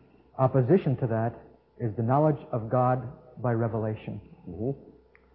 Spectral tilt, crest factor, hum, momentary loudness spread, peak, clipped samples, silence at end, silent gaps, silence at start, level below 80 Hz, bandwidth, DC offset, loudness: -13 dB/octave; 20 dB; none; 17 LU; -8 dBFS; under 0.1%; 0.45 s; none; 0.35 s; -58 dBFS; 4 kHz; under 0.1%; -28 LUFS